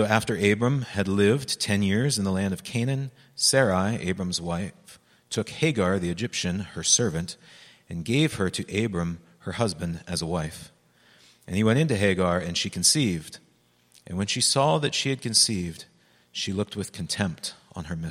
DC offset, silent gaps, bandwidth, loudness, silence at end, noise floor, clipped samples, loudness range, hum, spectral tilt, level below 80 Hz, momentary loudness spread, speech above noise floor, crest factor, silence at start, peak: under 0.1%; none; 15.5 kHz; -25 LUFS; 0 s; -63 dBFS; under 0.1%; 4 LU; none; -4 dB/octave; -54 dBFS; 15 LU; 38 dB; 22 dB; 0 s; -4 dBFS